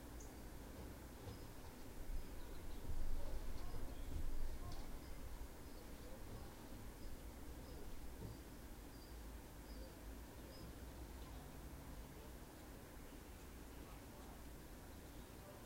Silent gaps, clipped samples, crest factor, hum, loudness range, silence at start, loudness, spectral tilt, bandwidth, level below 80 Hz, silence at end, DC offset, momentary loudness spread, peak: none; under 0.1%; 18 dB; none; 4 LU; 0 s; -55 LUFS; -5 dB/octave; 16 kHz; -50 dBFS; 0 s; under 0.1%; 6 LU; -30 dBFS